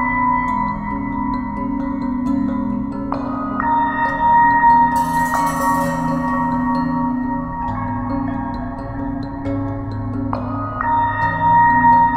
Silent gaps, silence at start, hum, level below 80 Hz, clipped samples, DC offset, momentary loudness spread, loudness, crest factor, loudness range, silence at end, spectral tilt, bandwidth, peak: none; 0 s; none; -36 dBFS; under 0.1%; under 0.1%; 12 LU; -18 LUFS; 14 dB; 7 LU; 0 s; -7 dB/octave; 16 kHz; -4 dBFS